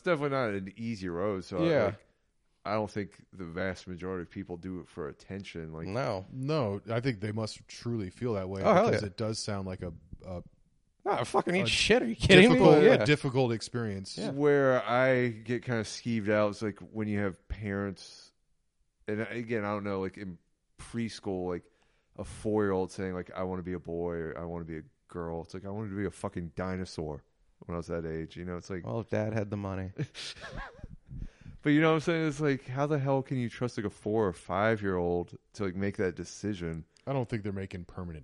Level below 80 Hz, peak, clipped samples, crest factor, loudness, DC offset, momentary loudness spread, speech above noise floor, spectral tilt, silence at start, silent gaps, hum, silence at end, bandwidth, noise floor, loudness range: -54 dBFS; -4 dBFS; under 0.1%; 26 dB; -30 LUFS; under 0.1%; 16 LU; 43 dB; -6 dB/octave; 0.05 s; none; none; 0 s; 11.5 kHz; -73 dBFS; 14 LU